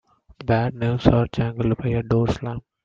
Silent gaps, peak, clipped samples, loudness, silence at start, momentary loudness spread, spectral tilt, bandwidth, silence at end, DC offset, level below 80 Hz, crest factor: none; 0 dBFS; under 0.1%; -22 LUFS; 0.4 s; 8 LU; -8.5 dB/octave; 7.2 kHz; 0.25 s; under 0.1%; -40 dBFS; 22 dB